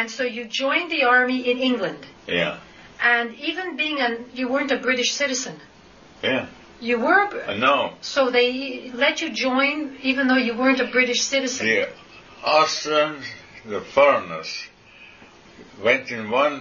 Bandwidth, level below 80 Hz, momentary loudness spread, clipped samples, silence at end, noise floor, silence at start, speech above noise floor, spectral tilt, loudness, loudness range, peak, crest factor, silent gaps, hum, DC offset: 7.2 kHz; -62 dBFS; 12 LU; under 0.1%; 0 s; -48 dBFS; 0 s; 27 dB; -2.5 dB/octave; -21 LUFS; 3 LU; -4 dBFS; 18 dB; none; none; under 0.1%